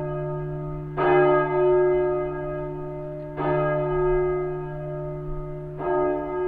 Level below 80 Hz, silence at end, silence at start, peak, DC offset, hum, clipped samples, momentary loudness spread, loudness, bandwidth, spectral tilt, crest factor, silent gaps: -40 dBFS; 0 s; 0 s; -8 dBFS; under 0.1%; none; under 0.1%; 14 LU; -25 LUFS; 3.7 kHz; -10.5 dB/octave; 16 dB; none